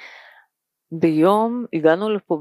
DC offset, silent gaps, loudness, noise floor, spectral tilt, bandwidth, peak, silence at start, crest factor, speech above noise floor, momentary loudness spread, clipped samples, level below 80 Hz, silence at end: under 0.1%; none; -19 LUFS; -67 dBFS; -7.5 dB/octave; 13 kHz; -2 dBFS; 0 s; 18 dB; 49 dB; 6 LU; under 0.1%; -78 dBFS; 0 s